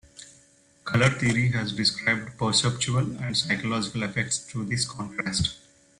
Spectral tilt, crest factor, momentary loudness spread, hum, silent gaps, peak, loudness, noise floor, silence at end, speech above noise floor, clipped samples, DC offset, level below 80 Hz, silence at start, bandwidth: -4 dB/octave; 20 dB; 7 LU; none; none; -6 dBFS; -25 LUFS; -59 dBFS; 0.4 s; 33 dB; under 0.1%; under 0.1%; -52 dBFS; 0.15 s; 11.5 kHz